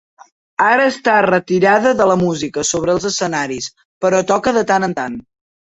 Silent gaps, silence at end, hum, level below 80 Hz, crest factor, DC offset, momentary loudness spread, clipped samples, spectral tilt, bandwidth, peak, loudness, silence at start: 3.85-4.01 s; 0.55 s; none; -52 dBFS; 14 dB; under 0.1%; 11 LU; under 0.1%; -4 dB/octave; 8.4 kHz; -2 dBFS; -15 LUFS; 0.6 s